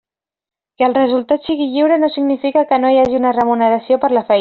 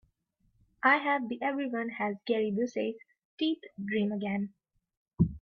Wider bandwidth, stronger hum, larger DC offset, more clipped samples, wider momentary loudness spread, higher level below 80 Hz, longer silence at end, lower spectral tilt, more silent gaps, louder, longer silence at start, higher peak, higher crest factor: second, 4.9 kHz vs 6.6 kHz; neither; neither; neither; second, 4 LU vs 10 LU; about the same, -54 dBFS vs -56 dBFS; about the same, 0 s vs 0.05 s; second, -3 dB/octave vs -7 dB/octave; second, none vs 3.25-3.37 s, 4.97-5.06 s; first, -14 LUFS vs -31 LUFS; about the same, 0.8 s vs 0.85 s; first, -2 dBFS vs -12 dBFS; second, 12 dB vs 20 dB